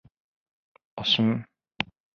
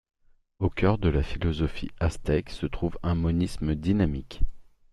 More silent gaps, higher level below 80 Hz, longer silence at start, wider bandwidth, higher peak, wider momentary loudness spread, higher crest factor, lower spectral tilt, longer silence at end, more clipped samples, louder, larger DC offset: neither; second, -64 dBFS vs -34 dBFS; first, 0.95 s vs 0.6 s; second, 6.8 kHz vs 12 kHz; first, -4 dBFS vs -8 dBFS; first, 12 LU vs 9 LU; first, 26 dB vs 18 dB; second, -5.5 dB/octave vs -7.5 dB/octave; about the same, 0.3 s vs 0.3 s; neither; about the same, -26 LUFS vs -28 LUFS; neither